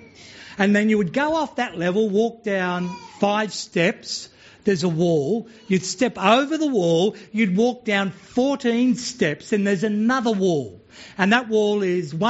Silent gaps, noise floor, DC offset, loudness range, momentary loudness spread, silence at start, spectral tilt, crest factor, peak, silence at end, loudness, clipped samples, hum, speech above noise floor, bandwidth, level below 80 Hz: none; -43 dBFS; under 0.1%; 3 LU; 8 LU; 0.2 s; -4.5 dB/octave; 18 dB; -2 dBFS; 0 s; -21 LUFS; under 0.1%; none; 23 dB; 8 kHz; -62 dBFS